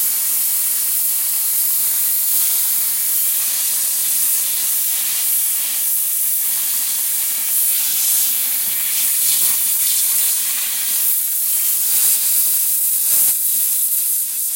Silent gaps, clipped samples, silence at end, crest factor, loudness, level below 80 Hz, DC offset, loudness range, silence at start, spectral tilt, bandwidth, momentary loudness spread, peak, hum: none; under 0.1%; 0 s; 16 dB; -14 LUFS; -70 dBFS; under 0.1%; 2 LU; 0 s; 3.5 dB/octave; 16.5 kHz; 3 LU; -2 dBFS; none